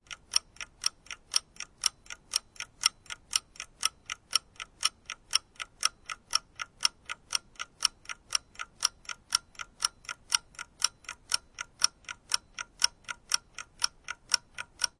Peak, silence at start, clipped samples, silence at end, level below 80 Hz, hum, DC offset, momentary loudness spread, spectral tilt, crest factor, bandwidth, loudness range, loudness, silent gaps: -4 dBFS; 0.1 s; under 0.1%; 0.1 s; -64 dBFS; none; under 0.1%; 15 LU; 2.5 dB/octave; 30 dB; 11.5 kHz; 1 LU; -31 LUFS; none